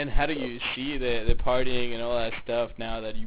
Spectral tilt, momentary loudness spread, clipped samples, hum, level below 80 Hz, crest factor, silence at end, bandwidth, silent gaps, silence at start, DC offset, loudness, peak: -9 dB/octave; 4 LU; under 0.1%; none; -34 dBFS; 18 dB; 0 s; 4 kHz; none; 0 s; under 0.1%; -29 LUFS; -8 dBFS